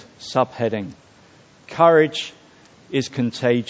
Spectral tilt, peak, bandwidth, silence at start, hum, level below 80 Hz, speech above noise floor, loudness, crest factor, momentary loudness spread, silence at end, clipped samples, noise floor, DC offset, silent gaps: -5.5 dB/octave; 0 dBFS; 8 kHz; 0.2 s; none; -62 dBFS; 31 dB; -20 LUFS; 20 dB; 17 LU; 0.05 s; under 0.1%; -50 dBFS; under 0.1%; none